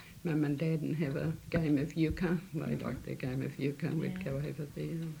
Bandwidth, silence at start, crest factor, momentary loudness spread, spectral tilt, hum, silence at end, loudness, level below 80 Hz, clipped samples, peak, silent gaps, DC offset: 17 kHz; 0 s; 16 dB; 7 LU; -8 dB/octave; none; 0 s; -35 LUFS; -54 dBFS; under 0.1%; -18 dBFS; none; under 0.1%